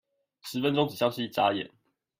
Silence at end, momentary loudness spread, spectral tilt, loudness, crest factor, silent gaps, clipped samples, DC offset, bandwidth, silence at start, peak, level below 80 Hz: 0.5 s; 13 LU; -5.5 dB/octave; -28 LUFS; 20 dB; none; under 0.1%; under 0.1%; 16 kHz; 0.45 s; -10 dBFS; -72 dBFS